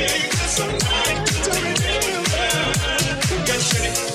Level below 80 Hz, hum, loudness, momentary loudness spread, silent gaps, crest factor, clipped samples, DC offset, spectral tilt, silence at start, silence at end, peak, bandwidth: -32 dBFS; none; -19 LUFS; 2 LU; none; 16 dB; under 0.1%; under 0.1%; -2.5 dB/octave; 0 s; 0 s; -6 dBFS; 16.5 kHz